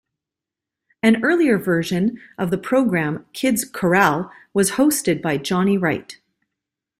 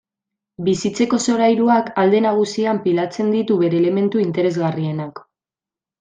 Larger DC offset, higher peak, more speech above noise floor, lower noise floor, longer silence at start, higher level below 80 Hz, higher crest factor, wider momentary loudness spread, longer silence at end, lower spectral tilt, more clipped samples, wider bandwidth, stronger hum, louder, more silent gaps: neither; about the same, -2 dBFS vs -4 dBFS; second, 68 dB vs 72 dB; second, -86 dBFS vs -90 dBFS; first, 1.05 s vs 0.6 s; first, -58 dBFS vs -64 dBFS; about the same, 18 dB vs 14 dB; about the same, 8 LU vs 7 LU; about the same, 0.85 s vs 0.8 s; about the same, -5 dB/octave vs -6 dB/octave; neither; first, 16 kHz vs 9.4 kHz; neither; about the same, -19 LUFS vs -18 LUFS; neither